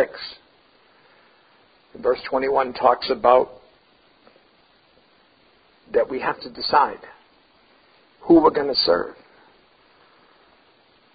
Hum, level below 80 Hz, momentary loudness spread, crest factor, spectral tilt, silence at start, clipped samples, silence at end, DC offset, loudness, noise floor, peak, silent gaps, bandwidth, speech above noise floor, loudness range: none; -58 dBFS; 16 LU; 24 dB; -9 dB/octave; 0 s; under 0.1%; 2 s; under 0.1%; -20 LUFS; -58 dBFS; 0 dBFS; none; 5.2 kHz; 38 dB; 5 LU